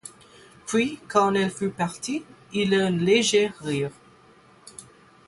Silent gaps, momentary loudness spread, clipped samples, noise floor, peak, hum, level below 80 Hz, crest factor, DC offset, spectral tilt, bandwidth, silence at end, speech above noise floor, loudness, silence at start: none; 23 LU; under 0.1%; -54 dBFS; -6 dBFS; none; -62 dBFS; 20 dB; under 0.1%; -4.5 dB/octave; 11.5 kHz; 0.45 s; 31 dB; -24 LUFS; 0.05 s